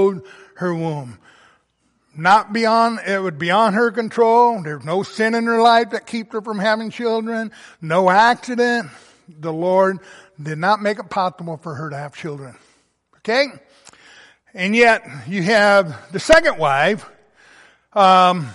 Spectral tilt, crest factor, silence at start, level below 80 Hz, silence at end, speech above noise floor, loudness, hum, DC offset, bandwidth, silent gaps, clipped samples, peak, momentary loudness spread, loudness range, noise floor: -5 dB/octave; 16 dB; 0 s; -52 dBFS; 0 s; 47 dB; -17 LUFS; none; under 0.1%; 11.5 kHz; none; under 0.1%; -2 dBFS; 17 LU; 8 LU; -65 dBFS